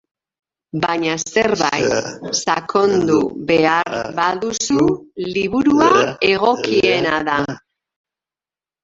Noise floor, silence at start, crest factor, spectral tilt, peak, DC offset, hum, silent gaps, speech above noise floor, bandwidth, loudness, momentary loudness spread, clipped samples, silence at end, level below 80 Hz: under -90 dBFS; 0.75 s; 16 dB; -4 dB/octave; 0 dBFS; under 0.1%; none; none; over 73 dB; 8 kHz; -17 LUFS; 8 LU; under 0.1%; 1.25 s; -50 dBFS